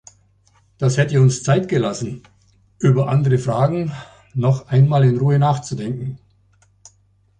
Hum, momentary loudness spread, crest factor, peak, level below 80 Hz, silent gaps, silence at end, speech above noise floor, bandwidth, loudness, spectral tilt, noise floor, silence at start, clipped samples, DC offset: none; 13 LU; 16 dB; -4 dBFS; -52 dBFS; none; 1.25 s; 41 dB; 9.4 kHz; -18 LUFS; -7 dB/octave; -58 dBFS; 0.8 s; under 0.1%; under 0.1%